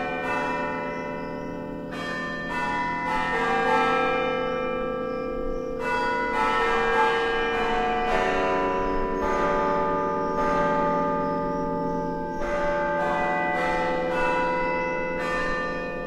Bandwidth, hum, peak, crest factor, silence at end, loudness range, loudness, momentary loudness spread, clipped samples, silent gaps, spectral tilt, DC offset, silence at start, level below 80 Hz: 13.5 kHz; none; -10 dBFS; 16 dB; 0 s; 2 LU; -25 LUFS; 8 LU; under 0.1%; none; -5.5 dB/octave; under 0.1%; 0 s; -40 dBFS